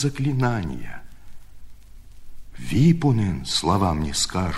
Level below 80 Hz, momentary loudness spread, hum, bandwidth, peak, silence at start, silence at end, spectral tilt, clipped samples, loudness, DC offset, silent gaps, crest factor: -40 dBFS; 19 LU; 50 Hz at -45 dBFS; 13.5 kHz; -6 dBFS; 0 s; 0 s; -5.5 dB/octave; under 0.1%; -22 LUFS; under 0.1%; none; 16 dB